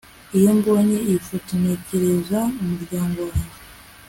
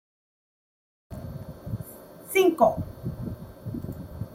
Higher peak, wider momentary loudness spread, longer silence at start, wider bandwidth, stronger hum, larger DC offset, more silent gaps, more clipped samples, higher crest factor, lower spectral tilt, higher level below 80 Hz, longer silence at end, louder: about the same, -4 dBFS vs -6 dBFS; second, 10 LU vs 20 LU; second, 0.3 s vs 1.1 s; about the same, 17 kHz vs 16.5 kHz; neither; neither; neither; neither; second, 16 dB vs 22 dB; about the same, -7 dB/octave vs -6 dB/octave; first, -42 dBFS vs -50 dBFS; first, 0.25 s vs 0 s; first, -21 LUFS vs -27 LUFS